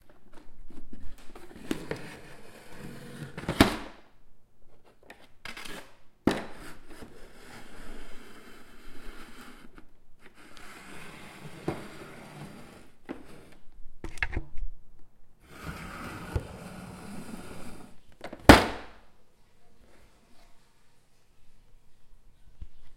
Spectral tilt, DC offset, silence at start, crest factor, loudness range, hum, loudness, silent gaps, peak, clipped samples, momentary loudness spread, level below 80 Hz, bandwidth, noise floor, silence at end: -5 dB/octave; under 0.1%; 0.05 s; 32 dB; 23 LU; none; -29 LUFS; none; 0 dBFS; under 0.1%; 26 LU; -44 dBFS; 16.5 kHz; -57 dBFS; 0 s